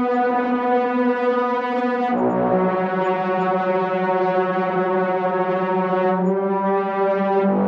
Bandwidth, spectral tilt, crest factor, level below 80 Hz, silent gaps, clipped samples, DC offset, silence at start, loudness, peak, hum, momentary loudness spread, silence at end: 6 kHz; -9 dB/octave; 12 dB; -64 dBFS; none; under 0.1%; under 0.1%; 0 s; -20 LUFS; -8 dBFS; none; 2 LU; 0 s